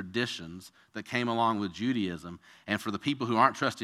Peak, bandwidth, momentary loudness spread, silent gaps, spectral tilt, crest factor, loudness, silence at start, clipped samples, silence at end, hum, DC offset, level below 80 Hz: -8 dBFS; 15 kHz; 19 LU; none; -5 dB/octave; 22 dB; -30 LUFS; 0 s; under 0.1%; 0 s; none; under 0.1%; -68 dBFS